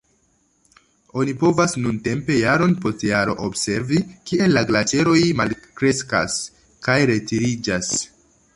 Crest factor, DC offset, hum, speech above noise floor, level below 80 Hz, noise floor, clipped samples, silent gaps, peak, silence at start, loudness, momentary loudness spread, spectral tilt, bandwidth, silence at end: 18 dB; under 0.1%; none; 44 dB; -50 dBFS; -63 dBFS; under 0.1%; none; -2 dBFS; 1.15 s; -20 LUFS; 8 LU; -4.5 dB/octave; 11.5 kHz; 0.5 s